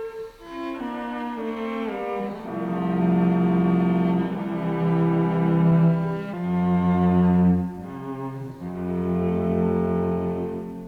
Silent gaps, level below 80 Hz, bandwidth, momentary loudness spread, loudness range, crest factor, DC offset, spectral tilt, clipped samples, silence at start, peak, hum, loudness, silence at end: none; -52 dBFS; 4.5 kHz; 13 LU; 5 LU; 14 dB; under 0.1%; -10 dB/octave; under 0.1%; 0 s; -10 dBFS; none; -23 LUFS; 0 s